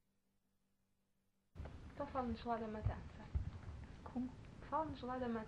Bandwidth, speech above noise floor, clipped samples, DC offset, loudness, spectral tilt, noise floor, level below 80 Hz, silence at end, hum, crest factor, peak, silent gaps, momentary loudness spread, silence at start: 9.4 kHz; 39 dB; under 0.1%; under 0.1%; -46 LUFS; -8 dB/octave; -82 dBFS; -56 dBFS; 0 s; none; 20 dB; -26 dBFS; none; 12 LU; 1.55 s